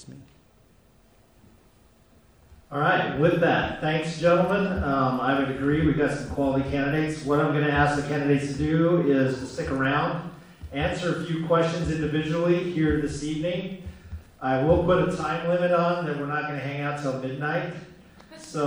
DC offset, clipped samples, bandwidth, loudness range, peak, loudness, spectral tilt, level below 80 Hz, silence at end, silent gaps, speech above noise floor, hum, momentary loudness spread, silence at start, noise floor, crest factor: under 0.1%; under 0.1%; over 20 kHz; 3 LU; -8 dBFS; -25 LUFS; -6.5 dB/octave; -44 dBFS; 0 s; none; 34 dB; none; 10 LU; 0 s; -58 dBFS; 18 dB